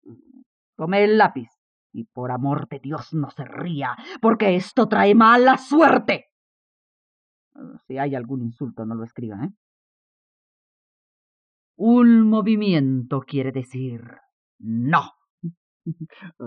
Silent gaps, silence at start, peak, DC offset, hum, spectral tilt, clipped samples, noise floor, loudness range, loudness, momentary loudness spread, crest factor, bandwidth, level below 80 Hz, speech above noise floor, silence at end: 0.46-0.73 s, 1.58-1.90 s, 6.32-7.51 s, 9.57-11.74 s, 14.32-14.59 s, 15.30-15.38 s, 15.57-15.80 s; 0.05 s; -4 dBFS; under 0.1%; none; -7.5 dB/octave; under 0.1%; under -90 dBFS; 14 LU; -19 LUFS; 22 LU; 18 dB; 8.8 kHz; -72 dBFS; over 70 dB; 0 s